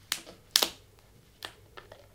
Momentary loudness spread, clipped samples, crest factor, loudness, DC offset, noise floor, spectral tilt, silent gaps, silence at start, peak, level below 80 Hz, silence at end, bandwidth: 25 LU; under 0.1%; 36 dB; -28 LUFS; under 0.1%; -59 dBFS; 0.5 dB/octave; none; 0.1 s; 0 dBFS; -64 dBFS; 0.2 s; 18 kHz